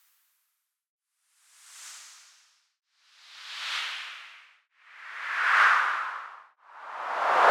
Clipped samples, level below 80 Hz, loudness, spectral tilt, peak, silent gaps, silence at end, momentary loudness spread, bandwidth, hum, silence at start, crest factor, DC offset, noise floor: under 0.1%; under -90 dBFS; -26 LUFS; 1 dB/octave; -8 dBFS; none; 0 s; 26 LU; 17 kHz; none; 1.7 s; 22 dB; under 0.1%; -79 dBFS